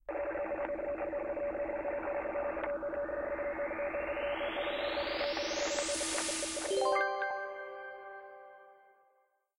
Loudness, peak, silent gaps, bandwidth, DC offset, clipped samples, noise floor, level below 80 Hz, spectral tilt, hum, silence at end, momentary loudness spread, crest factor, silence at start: -35 LUFS; -20 dBFS; none; 15.5 kHz; under 0.1%; under 0.1%; -74 dBFS; -60 dBFS; -1.5 dB/octave; none; 0.85 s; 12 LU; 18 dB; 0.1 s